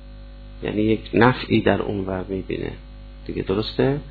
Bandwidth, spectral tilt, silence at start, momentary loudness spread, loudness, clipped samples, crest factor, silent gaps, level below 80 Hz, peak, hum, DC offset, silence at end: 4.8 kHz; -9.5 dB/octave; 0 s; 23 LU; -22 LUFS; under 0.1%; 20 dB; none; -38 dBFS; -2 dBFS; 50 Hz at -40 dBFS; under 0.1%; 0 s